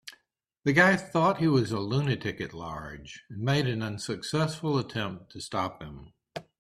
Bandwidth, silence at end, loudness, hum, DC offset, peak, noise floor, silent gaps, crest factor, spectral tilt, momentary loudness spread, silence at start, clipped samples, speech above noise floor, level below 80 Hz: 13.5 kHz; 0.2 s; -28 LUFS; none; under 0.1%; -6 dBFS; -71 dBFS; none; 24 dB; -6 dB/octave; 21 LU; 0.05 s; under 0.1%; 43 dB; -58 dBFS